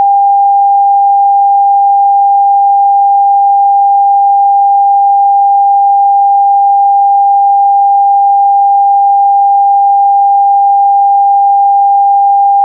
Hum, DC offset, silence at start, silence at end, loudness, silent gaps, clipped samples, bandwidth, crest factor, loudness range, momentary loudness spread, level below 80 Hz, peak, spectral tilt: none; under 0.1%; 0 s; 0 s; -7 LUFS; none; under 0.1%; 0.9 kHz; 4 dB; 0 LU; 0 LU; under -90 dBFS; -2 dBFS; -7 dB/octave